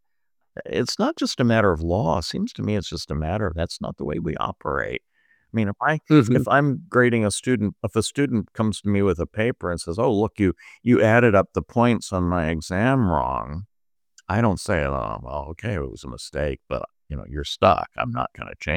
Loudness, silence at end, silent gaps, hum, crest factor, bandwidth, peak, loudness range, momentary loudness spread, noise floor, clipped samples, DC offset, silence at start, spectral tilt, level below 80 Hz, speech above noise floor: -23 LUFS; 0 s; none; none; 20 dB; 16 kHz; -2 dBFS; 6 LU; 12 LU; -80 dBFS; under 0.1%; under 0.1%; 0.6 s; -6 dB/octave; -42 dBFS; 58 dB